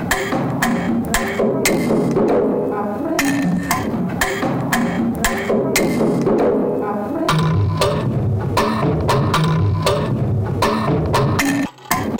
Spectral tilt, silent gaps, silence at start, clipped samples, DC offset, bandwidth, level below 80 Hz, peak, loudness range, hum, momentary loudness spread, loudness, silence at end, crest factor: -5.5 dB/octave; none; 0 s; under 0.1%; under 0.1%; 17 kHz; -36 dBFS; 0 dBFS; 1 LU; none; 4 LU; -18 LUFS; 0 s; 16 dB